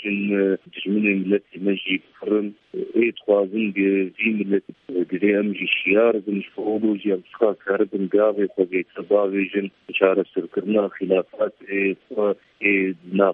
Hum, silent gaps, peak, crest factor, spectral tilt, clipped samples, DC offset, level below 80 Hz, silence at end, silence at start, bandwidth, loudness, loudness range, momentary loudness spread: none; none; 0 dBFS; 20 dB; -9.5 dB/octave; under 0.1%; under 0.1%; -70 dBFS; 0 s; 0 s; 3.8 kHz; -22 LUFS; 2 LU; 7 LU